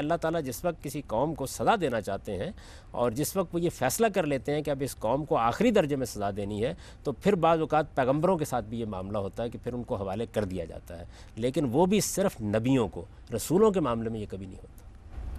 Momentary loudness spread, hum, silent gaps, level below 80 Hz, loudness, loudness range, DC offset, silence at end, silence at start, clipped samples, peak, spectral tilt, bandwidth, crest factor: 13 LU; none; none; -48 dBFS; -29 LUFS; 3 LU; under 0.1%; 0 s; 0 s; under 0.1%; -12 dBFS; -5.5 dB/octave; 14.5 kHz; 16 dB